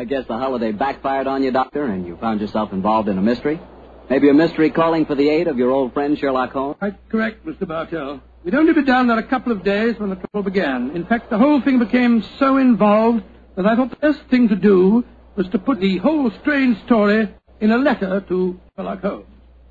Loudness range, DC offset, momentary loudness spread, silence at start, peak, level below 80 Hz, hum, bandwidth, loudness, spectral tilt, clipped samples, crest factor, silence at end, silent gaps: 4 LU; under 0.1%; 11 LU; 0 s; -2 dBFS; -48 dBFS; none; 7.2 kHz; -18 LUFS; -8.5 dB/octave; under 0.1%; 16 dB; 0.5 s; none